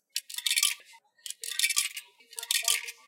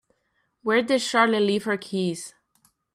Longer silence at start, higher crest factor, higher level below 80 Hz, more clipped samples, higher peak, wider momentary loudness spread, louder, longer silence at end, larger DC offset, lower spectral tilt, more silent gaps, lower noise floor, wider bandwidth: second, 0.15 s vs 0.65 s; about the same, 24 dB vs 20 dB; second, under -90 dBFS vs -72 dBFS; neither; about the same, -8 dBFS vs -6 dBFS; first, 17 LU vs 13 LU; second, -27 LUFS vs -23 LUFS; second, 0.15 s vs 0.65 s; neither; second, 8 dB/octave vs -4.5 dB/octave; neither; second, -57 dBFS vs -72 dBFS; first, 17 kHz vs 14 kHz